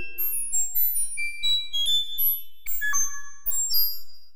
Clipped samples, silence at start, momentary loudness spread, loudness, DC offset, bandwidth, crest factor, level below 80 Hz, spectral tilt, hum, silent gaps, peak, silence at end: under 0.1%; 0 s; 7 LU; -24 LUFS; 4%; 16 kHz; 16 dB; -50 dBFS; 3 dB/octave; none; none; -10 dBFS; 0 s